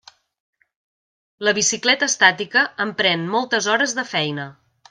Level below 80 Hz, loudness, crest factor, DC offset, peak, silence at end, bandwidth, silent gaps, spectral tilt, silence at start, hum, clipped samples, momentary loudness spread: -70 dBFS; -18 LUFS; 22 dB; under 0.1%; 0 dBFS; 0.4 s; 10.5 kHz; none; -1.5 dB/octave; 1.4 s; none; under 0.1%; 8 LU